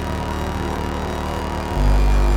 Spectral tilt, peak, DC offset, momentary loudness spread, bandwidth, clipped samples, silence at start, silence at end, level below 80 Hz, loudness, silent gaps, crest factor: -6 dB/octave; -6 dBFS; under 0.1%; 7 LU; 15.5 kHz; under 0.1%; 0 s; 0 s; -20 dBFS; -22 LUFS; none; 12 dB